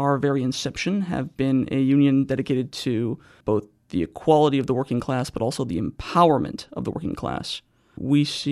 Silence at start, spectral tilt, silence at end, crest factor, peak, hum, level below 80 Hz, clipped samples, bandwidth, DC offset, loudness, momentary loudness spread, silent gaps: 0 s; -6.5 dB/octave; 0 s; 18 dB; -4 dBFS; none; -50 dBFS; under 0.1%; 12.5 kHz; under 0.1%; -23 LUFS; 12 LU; none